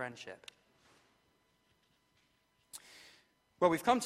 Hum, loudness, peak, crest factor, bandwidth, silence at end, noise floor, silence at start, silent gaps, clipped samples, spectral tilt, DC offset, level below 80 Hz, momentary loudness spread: none; -32 LUFS; -14 dBFS; 24 dB; 16 kHz; 0 s; -75 dBFS; 0 s; none; under 0.1%; -4.5 dB/octave; under 0.1%; -76 dBFS; 26 LU